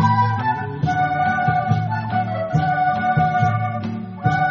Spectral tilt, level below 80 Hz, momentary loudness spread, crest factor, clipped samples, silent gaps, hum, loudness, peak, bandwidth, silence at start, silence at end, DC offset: -6 dB/octave; -48 dBFS; 5 LU; 14 dB; under 0.1%; none; none; -20 LUFS; -4 dBFS; 7 kHz; 0 s; 0 s; under 0.1%